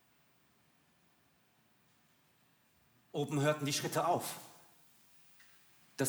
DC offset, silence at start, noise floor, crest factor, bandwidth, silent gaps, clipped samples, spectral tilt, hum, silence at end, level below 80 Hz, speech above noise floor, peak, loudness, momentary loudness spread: under 0.1%; 3.15 s; -71 dBFS; 22 dB; over 20 kHz; none; under 0.1%; -4.5 dB/octave; none; 0 s; -84 dBFS; 37 dB; -18 dBFS; -35 LUFS; 27 LU